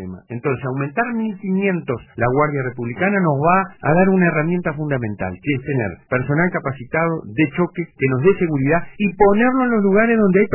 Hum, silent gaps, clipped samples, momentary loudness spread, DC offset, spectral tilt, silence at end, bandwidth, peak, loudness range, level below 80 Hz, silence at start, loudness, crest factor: none; none; under 0.1%; 9 LU; under 0.1%; -12 dB/octave; 0 s; 3.1 kHz; -2 dBFS; 4 LU; -46 dBFS; 0 s; -18 LUFS; 16 dB